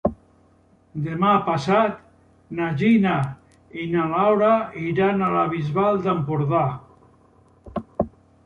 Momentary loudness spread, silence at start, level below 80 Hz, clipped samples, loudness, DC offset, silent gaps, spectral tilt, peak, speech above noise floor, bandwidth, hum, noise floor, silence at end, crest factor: 15 LU; 0.05 s; -52 dBFS; under 0.1%; -22 LUFS; under 0.1%; none; -8 dB/octave; -4 dBFS; 37 dB; 9.2 kHz; none; -57 dBFS; 0.35 s; 18 dB